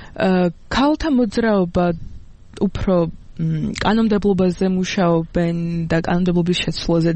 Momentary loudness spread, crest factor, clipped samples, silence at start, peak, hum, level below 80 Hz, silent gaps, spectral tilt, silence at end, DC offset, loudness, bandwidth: 6 LU; 14 dB; under 0.1%; 0 s; -4 dBFS; none; -36 dBFS; none; -6.5 dB/octave; 0 s; under 0.1%; -19 LUFS; 8.6 kHz